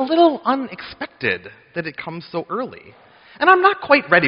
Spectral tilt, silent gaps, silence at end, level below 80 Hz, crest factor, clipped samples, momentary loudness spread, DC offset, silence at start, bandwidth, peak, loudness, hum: -2.5 dB/octave; none; 0 s; -60 dBFS; 18 dB; under 0.1%; 17 LU; under 0.1%; 0 s; 5.4 kHz; 0 dBFS; -18 LUFS; none